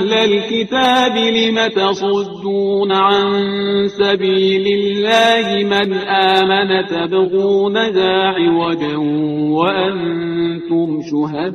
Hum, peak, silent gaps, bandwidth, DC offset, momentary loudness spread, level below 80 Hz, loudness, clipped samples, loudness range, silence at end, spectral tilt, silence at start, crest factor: none; 0 dBFS; none; 9.6 kHz; under 0.1%; 6 LU; -54 dBFS; -15 LUFS; under 0.1%; 2 LU; 0 s; -5 dB/octave; 0 s; 14 dB